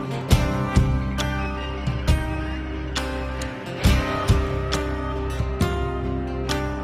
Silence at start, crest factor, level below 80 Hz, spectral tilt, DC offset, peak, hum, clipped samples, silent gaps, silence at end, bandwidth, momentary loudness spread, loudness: 0 s; 18 dB; -28 dBFS; -6 dB/octave; under 0.1%; -4 dBFS; none; under 0.1%; none; 0 s; 16 kHz; 7 LU; -24 LUFS